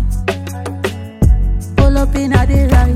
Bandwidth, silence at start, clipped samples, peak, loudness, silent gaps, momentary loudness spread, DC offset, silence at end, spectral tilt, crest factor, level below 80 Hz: 14.5 kHz; 0 s; under 0.1%; 0 dBFS; -15 LUFS; none; 10 LU; under 0.1%; 0 s; -7 dB/octave; 12 dB; -14 dBFS